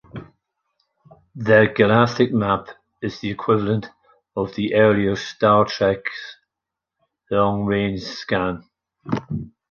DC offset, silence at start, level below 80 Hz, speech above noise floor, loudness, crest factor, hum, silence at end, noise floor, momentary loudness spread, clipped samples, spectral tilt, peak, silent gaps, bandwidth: under 0.1%; 0.15 s; -50 dBFS; 66 dB; -20 LUFS; 20 dB; none; 0.2 s; -85 dBFS; 15 LU; under 0.1%; -7 dB/octave; -2 dBFS; none; 7 kHz